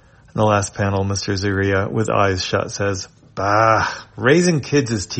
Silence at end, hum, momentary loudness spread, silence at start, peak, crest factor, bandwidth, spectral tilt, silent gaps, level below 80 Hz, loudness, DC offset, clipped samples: 0 s; none; 9 LU; 0.35 s; 0 dBFS; 18 dB; 8.8 kHz; -5 dB/octave; none; -50 dBFS; -18 LUFS; under 0.1%; under 0.1%